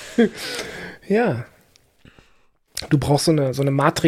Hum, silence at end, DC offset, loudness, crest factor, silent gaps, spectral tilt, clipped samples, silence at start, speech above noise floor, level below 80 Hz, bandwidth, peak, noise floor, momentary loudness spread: none; 0 s; under 0.1%; -21 LUFS; 20 dB; none; -5.5 dB/octave; under 0.1%; 0 s; 39 dB; -48 dBFS; 16 kHz; -2 dBFS; -58 dBFS; 15 LU